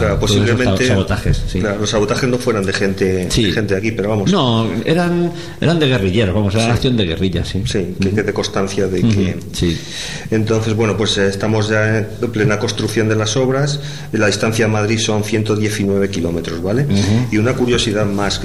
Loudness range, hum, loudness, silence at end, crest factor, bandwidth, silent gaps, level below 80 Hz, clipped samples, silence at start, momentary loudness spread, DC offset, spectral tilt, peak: 2 LU; none; -16 LUFS; 0 s; 10 dB; 13.5 kHz; none; -32 dBFS; under 0.1%; 0 s; 5 LU; 2%; -5.5 dB/octave; -4 dBFS